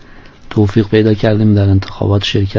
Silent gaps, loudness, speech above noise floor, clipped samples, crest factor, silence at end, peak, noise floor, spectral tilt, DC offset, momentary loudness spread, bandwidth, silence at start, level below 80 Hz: none; -12 LUFS; 24 dB; under 0.1%; 12 dB; 0 s; 0 dBFS; -35 dBFS; -7.5 dB/octave; under 0.1%; 4 LU; 7.2 kHz; 0.15 s; -30 dBFS